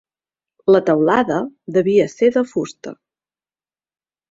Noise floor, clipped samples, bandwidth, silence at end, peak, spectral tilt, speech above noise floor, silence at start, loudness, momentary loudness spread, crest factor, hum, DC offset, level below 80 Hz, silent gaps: under -90 dBFS; under 0.1%; 7.8 kHz; 1.35 s; -2 dBFS; -6.5 dB/octave; over 74 dB; 0.65 s; -17 LUFS; 13 LU; 18 dB; none; under 0.1%; -60 dBFS; none